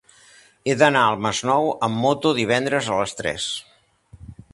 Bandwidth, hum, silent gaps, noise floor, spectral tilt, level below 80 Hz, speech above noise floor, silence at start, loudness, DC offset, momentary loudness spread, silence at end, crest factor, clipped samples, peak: 11.5 kHz; none; none; -52 dBFS; -4 dB/octave; -54 dBFS; 31 dB; 0.65 s; -21 LUFS; under 0.1%; 10 LU; 0.2 s; 22 dB; under 0.1%; 0 dBFS